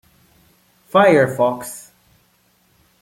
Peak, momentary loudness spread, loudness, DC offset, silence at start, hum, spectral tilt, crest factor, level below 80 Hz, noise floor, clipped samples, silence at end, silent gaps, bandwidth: -2 dBFS; 19 LU; -16 LUFS; under 0.1%; 0.95 s; none; -5.5 dB/octave; 18 dB; -62 dBFS; -59 dBFS; under 0.1%; 1.2 s; none; 16.5 kHz